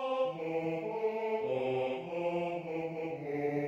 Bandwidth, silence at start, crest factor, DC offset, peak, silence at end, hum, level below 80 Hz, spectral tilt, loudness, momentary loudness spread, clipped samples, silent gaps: 7.8 kHz; 0 s; 12 dB; under 0.1%; -22 dBFS; 0 s; none; -76 dBFS; -7.5 dB/octave; -35 LUFS; 4 LU; under 0.1%; none